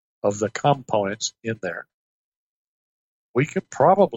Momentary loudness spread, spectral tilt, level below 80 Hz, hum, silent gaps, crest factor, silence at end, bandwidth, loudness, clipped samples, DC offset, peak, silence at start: 11 LU; -5 dB/octave; -66 dBFS; none; 1.94-3.34 s; 20 dB; 0 s; 8.2 kHz; -23 LUFS; under 0.1%; under 0.1%; -4 dBFS; 0.25 s